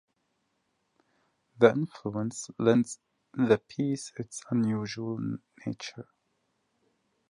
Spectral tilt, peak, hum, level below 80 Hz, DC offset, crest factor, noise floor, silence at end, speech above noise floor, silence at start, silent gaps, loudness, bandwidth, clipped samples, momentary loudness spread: -6 dB/octave; -6 dBFS; none; -70 dBFS; under 0.1%; 26 dB; -77 dBFS; 1.25 s; 48 dB; 1.6 s; none; -29 LUFS; 11 kHz; under 0.1%; 16 LU